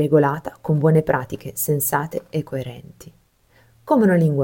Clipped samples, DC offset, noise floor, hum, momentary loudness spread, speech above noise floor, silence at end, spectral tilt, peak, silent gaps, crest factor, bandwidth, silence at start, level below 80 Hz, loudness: under 0.1%; under 0.1%; -57 dBFS; none; 13 LU; 37 dB; 0 s; -7 dB/octave; -4 dBFS; none; 16 dB; 17 kHz; 0 s; -54 dBFS; -20 LUFS